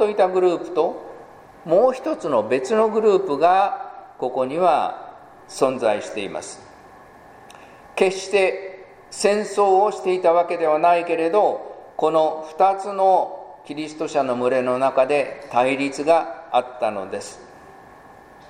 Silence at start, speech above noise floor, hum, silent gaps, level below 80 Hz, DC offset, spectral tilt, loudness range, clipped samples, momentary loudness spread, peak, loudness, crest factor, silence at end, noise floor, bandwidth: 0 s; 26 dB; none; none; -64 dBFS; under 0.1%; -4.5 dB/octave; 5 LU; under 0.1%; 15 LU; -2 dBFS; -20 LUFS; 20 dB; 0.8 s; -45 dBFS; 14.5 kHz